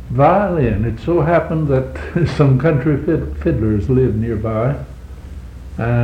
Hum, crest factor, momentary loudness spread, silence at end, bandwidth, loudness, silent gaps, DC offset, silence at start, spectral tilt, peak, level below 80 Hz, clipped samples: none; 16 dB; 19 LU; 0 s; 8.6 kHz; -16 LUFS; none; under 0.1%; 0 s; -9.5 dB/octave; 0 dBFS; -30 dBFS; under 0.1%